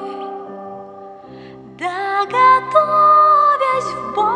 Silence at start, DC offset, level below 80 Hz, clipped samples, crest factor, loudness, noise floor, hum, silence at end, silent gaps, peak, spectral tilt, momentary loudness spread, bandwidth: 0 s; under 0.1%; -60 dBFS; under 0.1%; 16 dB; -14 LUFS; -37 dBFS; none; 0 s; none; 0 dBFS; -4.5 dB/octave; 22 LU; 10 kHz